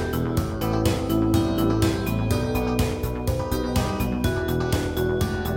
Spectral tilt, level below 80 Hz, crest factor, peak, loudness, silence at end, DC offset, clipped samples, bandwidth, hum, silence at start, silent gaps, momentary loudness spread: -6 dB/octave; -32 dBFS; 14 dB; -8 dBFS; -24 LUFS; 0 s; under 0.1%; under 0.1%; 17 kHz; none; 0 s; none; 4 LU